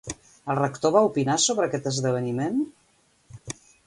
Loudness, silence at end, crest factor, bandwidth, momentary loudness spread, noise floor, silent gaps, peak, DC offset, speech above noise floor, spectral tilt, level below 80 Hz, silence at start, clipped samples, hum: -24 LUFS; 0.35 s; 20 dB; 11.5 kHz; 17 LU; -57 dBFS; none; -6 dBFS; under 0.1%; 33 dB; -4.5 dB/octave; -60 dBFS; 0.05 s; under 0.1%; none